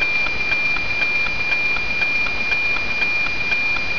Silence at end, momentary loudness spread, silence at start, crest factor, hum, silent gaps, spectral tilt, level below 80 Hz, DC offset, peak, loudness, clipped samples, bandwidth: 0 s; 1 LU; 0 s; 12 dB; none; none; -3 dB/octave; -40 dBFS; 6%; -8 dBFS; -18 LUFS; under 0.1%; 5.4 kHz